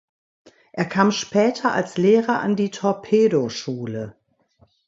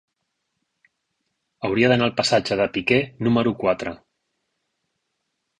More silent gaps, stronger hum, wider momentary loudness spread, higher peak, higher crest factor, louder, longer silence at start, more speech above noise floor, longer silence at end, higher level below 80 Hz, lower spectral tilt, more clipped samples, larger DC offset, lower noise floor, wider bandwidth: neither; neither; first, 12 LU vs 8 LU; about the same, -2 dBFS vs -4 dBFS; about the same, 20 dB vs 20 dB; about the same, -20 LUFS vs -21 LUFS; second, 0.75 s vs 1.6 s; second, 40 dB vs 56 dB; second, 0.75 s vs 1.65 s; second, -64 dBFS vs -56 dBFS; about the same, -5.5 dB/octave vs -5.5 dB/octave; neither; neither; second, -60 dBFS vs -77 dBFS; second, 7.8 kHz vs 11 kHz